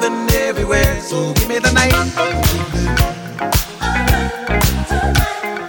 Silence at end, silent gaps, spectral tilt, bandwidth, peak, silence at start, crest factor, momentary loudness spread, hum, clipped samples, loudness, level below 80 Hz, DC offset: 0 s; none; -4.5 dB/octave; 17.5 kHz; -2 dBFS; 0 s; 14 dB; 5 LU; none; under 0.1%; -16 LUFS; -22 dBFS; under 0.1%